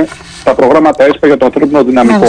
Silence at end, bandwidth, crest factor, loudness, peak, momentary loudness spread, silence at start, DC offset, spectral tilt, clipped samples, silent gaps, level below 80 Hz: 0 s; 10 kHz; 8 dB; -8 LUFS; 0 dBFS; 7 LU; 0 s; under 0.1%; -6 dB/octave; 0.1%; none; -40 dBFS